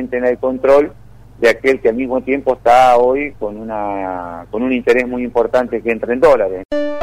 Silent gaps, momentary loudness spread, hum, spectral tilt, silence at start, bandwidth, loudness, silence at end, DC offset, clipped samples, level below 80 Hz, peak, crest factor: 6.65-6.69 s; 12 LU; none; -5.5 dB/octave; 0 s; 15 kHz; -15 LUFS; 0 s; under 0.1%; under 0.1%; -42 dBFS; -2 dBFS; 12 dB